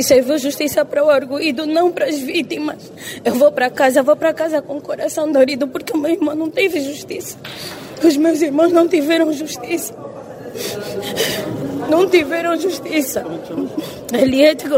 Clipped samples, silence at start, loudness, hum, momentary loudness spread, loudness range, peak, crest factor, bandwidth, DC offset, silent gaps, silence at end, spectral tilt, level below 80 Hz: under 0.1%; 0 s; -17 LUFS; none; 13 LU; 3 LU; 0 dBFS; 16 dB; 16.5 kHz; under 0.1%; none; 0 s; -4 dB/octave; -56 dBFS